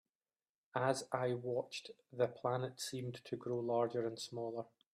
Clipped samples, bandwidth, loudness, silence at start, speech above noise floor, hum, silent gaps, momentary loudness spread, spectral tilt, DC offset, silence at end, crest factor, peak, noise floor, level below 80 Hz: under 0.1%; 14.5 kHz; -40 LUFS; 0.75 s; over 50 dB; none; none; 9 LU; -5 dB/octave; under 0.1%; 0.25 s; 20 dB; -20 dBFS; under -90 dBFS; -82 dBFS